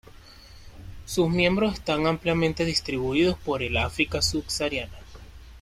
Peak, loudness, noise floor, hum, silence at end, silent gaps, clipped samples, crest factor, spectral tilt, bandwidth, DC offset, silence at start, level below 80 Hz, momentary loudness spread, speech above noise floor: -8 dBFS; -25 LUFS; -48 dBFS; none; 0 s; none; under 0.1%; 18 dB; -4.5 dB/octave; 15.5 kHz; under 0.1%; 0.05 s; -44 dBFS; 8 LU; 23 dB